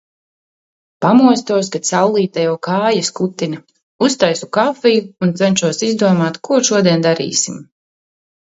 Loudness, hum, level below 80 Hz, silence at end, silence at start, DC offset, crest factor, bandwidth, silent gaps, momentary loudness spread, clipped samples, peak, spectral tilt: -15 LUFS; none; -62 dBFS; 0.8 s; 1 s; under 0.1%; 16 dB; 8 kHz; 3.83-3.99 s; 7 LU; under 0.1%; 0 dBFS; -4.5 dB/octave